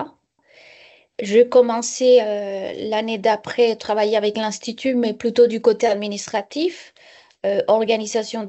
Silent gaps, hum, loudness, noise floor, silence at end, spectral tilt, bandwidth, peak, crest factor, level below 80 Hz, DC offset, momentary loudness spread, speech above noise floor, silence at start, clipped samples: none; none; -19 LUFS; -54 dBFS; 0 s; -3.5 dB/octave; 8.4 kHz; -4 dBFS; 16 dB; -66 dBFS; under 0.1%; 10 LU; 36 dB; 0 s; under 0.1%